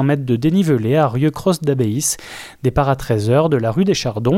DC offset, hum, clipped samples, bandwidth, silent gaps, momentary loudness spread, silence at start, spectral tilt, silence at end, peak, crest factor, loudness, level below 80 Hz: under 0.1%; none; under 0.1%; 16.5 kHz; none; 5 LU; 0 s; -6 dB/octave; 0 s; -2 dBFS; 14 dB; -17 LUFS; -38 dBFS